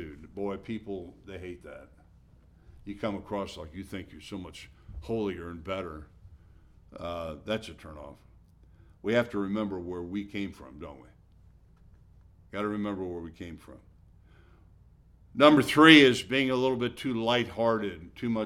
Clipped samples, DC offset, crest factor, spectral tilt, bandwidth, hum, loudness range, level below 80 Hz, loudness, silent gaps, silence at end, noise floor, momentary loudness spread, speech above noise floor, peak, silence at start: under 0.1%; under 0.1%; 28 dB; -5 dB/octave; 14 kHz; none; 17 LU; -56 dBFS; -27 LUFS; none; 0 s; -58 dBFS; 25 LU; 30 dB; -2 dBFS; 0 s